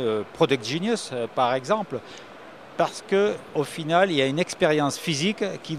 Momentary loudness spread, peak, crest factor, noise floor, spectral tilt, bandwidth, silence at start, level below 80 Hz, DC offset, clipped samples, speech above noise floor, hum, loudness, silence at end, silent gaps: 13 LU; -4 dBFS; 20 dB; -44 dBFS; -4.5 dB/octave; 15 kHz; 0 s; -66 dBFS; 0.1%; under 0.1%; 20 dB; none; -24 LUFS; 0 s; none